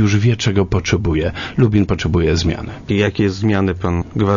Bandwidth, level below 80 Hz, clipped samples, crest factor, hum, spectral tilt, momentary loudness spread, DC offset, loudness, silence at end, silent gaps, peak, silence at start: 7.4 kHz; -32 dBFS; under 0.1%; 16 dB; none; -6.5 dB/octave; 6 LU; under 0.1%; -17 LUFS; 0 s; none; 0 dBFS; 0 s